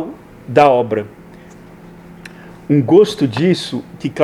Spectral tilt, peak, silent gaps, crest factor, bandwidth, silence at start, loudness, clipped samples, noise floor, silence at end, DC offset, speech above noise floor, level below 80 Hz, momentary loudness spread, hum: -7 dB/octave; 0 dBFS; none; 16 dB; 13 kHz; 0 s; -14 LUFS; under 0.1%; -39 dBFS; 0 s; under 0.1%; 25 dB; -52 dBFS; 25 LU; none